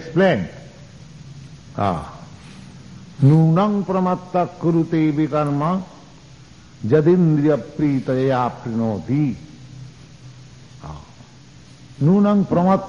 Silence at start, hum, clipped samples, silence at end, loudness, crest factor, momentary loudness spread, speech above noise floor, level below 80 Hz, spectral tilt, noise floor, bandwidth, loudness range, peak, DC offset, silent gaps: 0 s; none; under 0.1%; 0 s; -19 LUFS; 16 dB; 25 LU; 27 dB; -50 dBFS; -9 dB/octave; -44 dBFS; 7.4 kHz; 7 LU; -4 dBFS; 0.2%; none